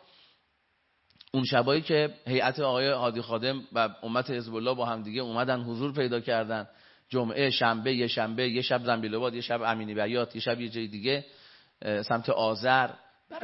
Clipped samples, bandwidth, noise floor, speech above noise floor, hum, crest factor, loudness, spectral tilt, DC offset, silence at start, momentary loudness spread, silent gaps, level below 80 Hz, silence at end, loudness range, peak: under 0.1%; 6 kHz; -72 dBFS; 44 dB; none; 22 dB; -29 LUFS; -8.5 dB/octave; under 0.1%; 1.35 s; 8 LU; none; -74 dBFS; 0 s; 3 LU; -8 dBFS